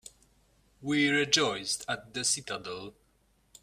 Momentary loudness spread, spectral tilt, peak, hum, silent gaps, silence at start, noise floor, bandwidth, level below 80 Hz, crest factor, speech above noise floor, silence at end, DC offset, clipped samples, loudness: 17 LU; -2 dB/octave; -8 dBFS; none; none; 0.05 s; -69 dBFS; 15.5 kHz; -66 dBFS; 26 dB; 38 dB; 0.7 s; under 0.1%; under 0.1%; -28 LUFS